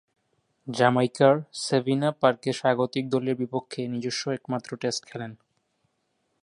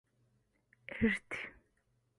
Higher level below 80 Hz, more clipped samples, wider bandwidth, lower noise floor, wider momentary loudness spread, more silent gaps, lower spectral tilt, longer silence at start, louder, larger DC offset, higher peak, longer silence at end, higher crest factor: second, -72 dBFS vs -60 dBFS; neither; about the same, 11.5 kHz vs 11.5 kHz; about the same, -74 dBFS vs -77 dBFS; second, 12 LU vs 16 LU; neither; about the same, -5.5 dB/octave vs -6 dB/octave; second, 0.65 s vs 0.9 s; first, -26 LUFS vs -36 LUFS; neither; first, -4 dBFS vs -18 dBFS; first, 1.1 s vs 0.65 s; about the same, 22 dB vs 22 dB